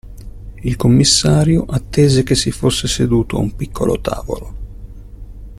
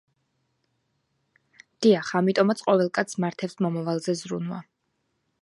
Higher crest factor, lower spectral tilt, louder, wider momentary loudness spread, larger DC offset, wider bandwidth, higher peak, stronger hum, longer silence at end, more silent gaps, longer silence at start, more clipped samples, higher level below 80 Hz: about the same, 16 dB vs 20 dB; about the same, -5 dB/octave vs -6 dB/octave; first, -15 LUFS vs -25 LUFS; first, 19 LU vs 10 LU; neither; first, 14 kHz vs 11.5 kHz; first, 0 dBFS vs -6 dBFS; first, 50 Hz at -35 dBFS vs none; second, 0 s vs 0.8 s; neither; second, 0.05 s vs 1.8 s; neither; first, -30 dBFS vs -74 dBFS